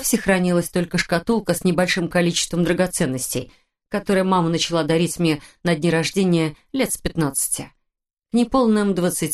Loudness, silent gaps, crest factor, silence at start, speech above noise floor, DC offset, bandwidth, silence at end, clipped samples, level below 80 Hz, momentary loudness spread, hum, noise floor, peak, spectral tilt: -20 LUFS; none; 18 dB; 0 s; 58 dB; under 0.1%; 13 kHz; 0 s; under 0.1%; -44 dBFS; 6 LU; none; -78 dBFS; -2 dBFS; -4.5 dB/octave